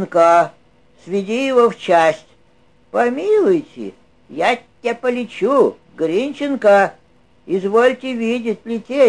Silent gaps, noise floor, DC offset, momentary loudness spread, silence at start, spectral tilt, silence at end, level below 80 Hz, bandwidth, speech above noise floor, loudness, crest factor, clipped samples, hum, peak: none; -55 dBFS; 0.2%; 11 LU; 0 s; -5.5 dB/octave; 0 s; -62 dBFS; 11 kHz; 39 dB; -17 LUFS; 16 dB; under 0.1%; none; -2 dBFS